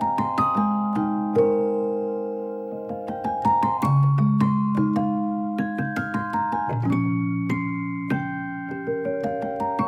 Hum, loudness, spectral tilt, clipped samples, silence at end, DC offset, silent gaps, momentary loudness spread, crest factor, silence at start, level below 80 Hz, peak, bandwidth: none; -24 LUFS; -9.5 dB/octave; under 0.1%; 0 s; under 0.1%; none; 9 LU; 14 dB; 0 s; -58 dBFS; -8 dBFS; 9.2 kHz